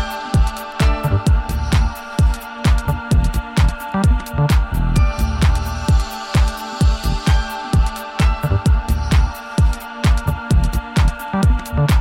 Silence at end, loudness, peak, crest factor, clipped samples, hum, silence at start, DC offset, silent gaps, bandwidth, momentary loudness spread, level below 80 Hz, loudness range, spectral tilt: 0 s; -18 LUFS; -2 dBFS; 14 dB; under 0.1%; none; 0 s; under 0.1%; none; 16.5 kHz; 3 LU; -18 dBFS; 1 LU; -6 dB/octave